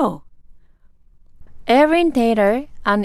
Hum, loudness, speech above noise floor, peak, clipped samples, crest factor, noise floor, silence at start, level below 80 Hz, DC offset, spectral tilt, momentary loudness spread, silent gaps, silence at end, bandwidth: none; -16 LUFS; 34 dB; -4 dBFS; under 0.1%; 16 dB; -49 dBFS; 0 s; -44 dBFS; under 0.1%; -6 dB/octave; 14 LU; none; 0 s; 14 kHz